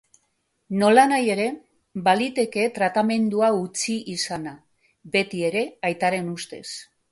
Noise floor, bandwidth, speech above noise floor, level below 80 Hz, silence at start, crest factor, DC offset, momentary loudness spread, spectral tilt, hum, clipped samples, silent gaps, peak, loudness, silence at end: -72 dBFS; 11.5 kHz; 50 dB; -66 dBFS; 0.7 s; 20 dB; under 0.1%; 16 LU; -4.5 dB/octave; none; under 0.1%; none; -4 dBFS; -22 LUFS; 0.3 s